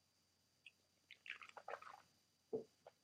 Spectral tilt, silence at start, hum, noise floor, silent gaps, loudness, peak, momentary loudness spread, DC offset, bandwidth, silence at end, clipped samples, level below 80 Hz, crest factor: -4 dB/octave; 0.65 s; none; -81 dBFS; none; -54 LUFS; -34 dBFS; 15 LU; under 0.1%; 14.5 kHz; 0.1 s; under 0.1%; under -90 dBFS; 24 dB